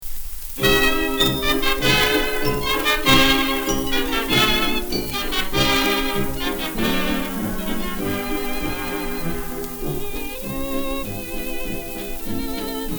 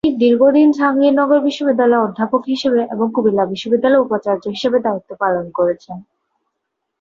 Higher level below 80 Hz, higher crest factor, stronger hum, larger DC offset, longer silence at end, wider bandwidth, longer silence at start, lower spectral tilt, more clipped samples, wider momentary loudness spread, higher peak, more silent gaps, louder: first, -30 dBFS vs -58 dBFS; first, 18 dB vs 12 dB; neither; first, 0.6% vs under 0.1%; second, 0 s vs 1 s; first, over 20 kHz vs 7.4 kHz; about the same, 0 s vs 0.05 s; second, -3.5 dB/octave vs -6.5 dB/octave; neither; first, 12 LU vs 7 LU; about the same, -2 dBFS vs -2 dBFS; neither; second, -21 LUFS vs -15 LUFS